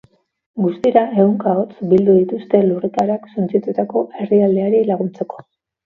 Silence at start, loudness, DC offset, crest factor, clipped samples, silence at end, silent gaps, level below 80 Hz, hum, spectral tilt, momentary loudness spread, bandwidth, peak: 0.55 s; -16 LUFS; under 0.1%; 16 dB; under 0.1%; 0.45 s; none; -60 dBFS; none; -10 dB/octave; 8 LU; 6.4 kHz; 0 dBFS